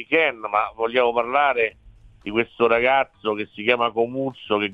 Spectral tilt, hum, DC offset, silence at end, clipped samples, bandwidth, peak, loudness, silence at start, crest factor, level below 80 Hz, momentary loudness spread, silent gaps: -6.5 dB/octave; none; under 0.1%; 0 s; under 0.1%; 4.9 kHz; -2 dBFS; -21 LUFS; 0 s; 18 dB; -56 dBFS; 8 LU; none